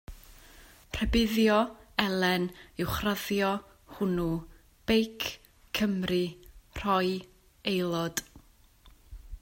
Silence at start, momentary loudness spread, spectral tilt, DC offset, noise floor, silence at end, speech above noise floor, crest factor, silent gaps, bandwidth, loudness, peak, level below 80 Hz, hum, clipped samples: 0.1 s; 11 LU; -5 dB/octave; under 0.1%; -58 dBFS; 0.05 s; 30 dB; 22 dB; none; 16.5 kHz; -30 LUFS; -8 dBFS; -46 dBFS; none; under 0.1%